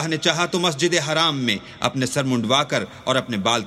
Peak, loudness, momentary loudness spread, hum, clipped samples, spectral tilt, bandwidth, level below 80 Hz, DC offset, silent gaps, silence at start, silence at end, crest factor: -2 dBFS; -21 LUFS; 5 LU; none; under 0.1%; -3.5 dB/octave; 14.5 kHz; -58 dBFS; under 0.1%; none; 0 s; 0 s; 20 dB